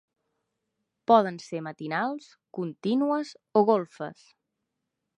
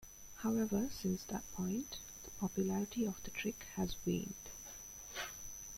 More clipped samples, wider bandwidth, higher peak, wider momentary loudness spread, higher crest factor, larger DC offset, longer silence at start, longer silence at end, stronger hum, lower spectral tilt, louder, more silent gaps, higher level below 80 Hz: neither; second, 9.8 kHz vs 16.5 kHz; first, -6 dBFS vs -24 dBFS; first, 17 LU vs 11 LU; first, 22 dB vs 16 dB; neither; first, 1.1 s vs 0 s; first, 1.05 s vs 0 s; neither; first, -6.5 dB/octave vs -4.5 dB/octave; first, -26 LUFS vs -41 LUFS; neither; second, -82 dBFS vs -60 dBFS